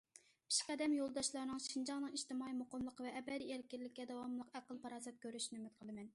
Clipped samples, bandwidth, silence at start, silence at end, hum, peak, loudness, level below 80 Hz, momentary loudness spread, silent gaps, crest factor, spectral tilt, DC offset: under 0.1%; 11.5 kHz; 0.15 s; 0.05 s; none; -24 dBFS; -45 LUFS; -80 dBFS; 12 LU; none; 20 dB; -2 dB/octave; under 0.1%